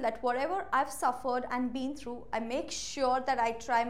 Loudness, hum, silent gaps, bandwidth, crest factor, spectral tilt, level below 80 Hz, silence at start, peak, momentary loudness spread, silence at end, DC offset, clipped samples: -32 LUFS; none; none; 16 kHz; 16 dB; -3 dB/octave; -60 dBFS; 0 s; -16 dBFS; 8 LU; 0 s; 0.4%; under 0.1%